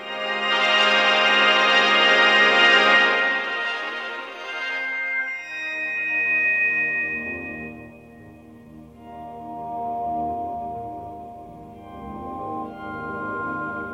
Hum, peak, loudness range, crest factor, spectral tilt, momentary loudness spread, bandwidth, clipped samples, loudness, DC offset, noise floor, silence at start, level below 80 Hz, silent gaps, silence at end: none; -2 dBFS; 17 LU; 20 dB; -2.5 dB/octave; 21 LU; 15 kHz; under 0.1%; -19 LUFS; under 0.1%; -45 dBFS; 0 s; -56 dBFS; none; 0 s